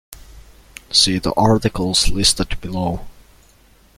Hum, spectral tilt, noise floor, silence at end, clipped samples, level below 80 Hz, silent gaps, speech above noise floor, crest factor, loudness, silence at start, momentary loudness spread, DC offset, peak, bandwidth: none; -3.5 dB/octave; -51 dBFS; 0.85 s; under 0.1%; -32 dBFS; none; 34 dB; 18 dB; -17 LUFS; 0.1 s; 10 LU; under 0.1%; 0 dBFS; 16 kHz